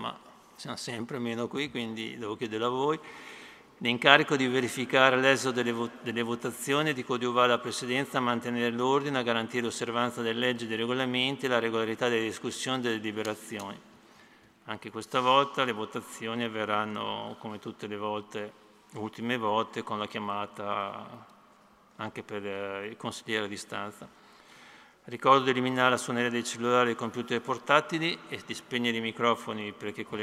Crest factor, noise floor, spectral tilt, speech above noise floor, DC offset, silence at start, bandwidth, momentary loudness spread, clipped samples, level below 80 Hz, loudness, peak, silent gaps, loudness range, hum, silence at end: 30 dB; -60 dBFS; -4 dB/octave; 30 dB; under 0.1%; 0 s; 16 kHz; 15 LU; under 0.1%; -76 dBFS; -29 LUFS; 0 dBFS; none; 10 LU; none; 0 s